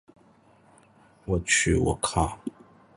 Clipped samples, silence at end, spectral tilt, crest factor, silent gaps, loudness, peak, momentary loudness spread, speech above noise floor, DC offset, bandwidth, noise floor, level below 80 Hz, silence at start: under 0.1%; 0.45 s; -4 dB/octave; 22 dB; none; -25 LUFS; -8 dBFS; 18 LU; 33 dB; under 0.1%; 11.5 kHz; -58 dBFS; -40 dBFS; 1.25 s